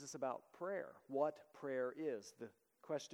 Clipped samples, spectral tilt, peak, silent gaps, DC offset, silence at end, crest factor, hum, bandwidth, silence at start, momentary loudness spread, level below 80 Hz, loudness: under 0.1%; -4.5 dB/octave; -26 dBFS; none; under 0.1%; 0 s; 20 dB; none; 17.5 kHz; 0 s; 12 LU; under -90 dBFS; -45 LUFS